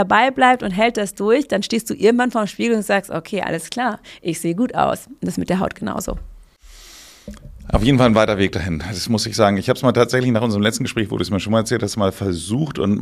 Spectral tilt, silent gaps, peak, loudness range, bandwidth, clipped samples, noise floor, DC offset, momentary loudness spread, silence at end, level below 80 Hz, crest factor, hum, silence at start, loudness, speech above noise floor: -5.5 dB/octave; none; 0 dBFS; 6 LU; 15.5 kHz; under 0.1%; -43 dBFS; under 0.1%; 10 LU; 0 s; -38 dBFS; 18 dB; none; 0 s; -19 LUFS; 25 dB